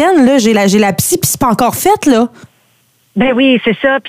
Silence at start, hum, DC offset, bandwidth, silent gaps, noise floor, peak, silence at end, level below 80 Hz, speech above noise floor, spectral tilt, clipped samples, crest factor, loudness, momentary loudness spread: 0 s; none; under 0.1%; 16 kHz; none; -54 dBFS; 0 dBFS; 0 s; -44 dBFS; 44 dB; -4 dB/octave; under 0.1%; 10 dB; -10 LUFS; 5 LU